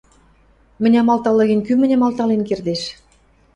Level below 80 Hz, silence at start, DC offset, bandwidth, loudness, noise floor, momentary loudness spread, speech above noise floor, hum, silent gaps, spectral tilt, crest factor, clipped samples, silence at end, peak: -54 dBFS; 0.8 s; under 0.1%; 10 kHz; -17 LUFS; -54 dBFS; 8 LU; 38 dB; none; none; -6.5 dB/octave; 14 dB; under 0.1%; 0.65 s; -4 dBFS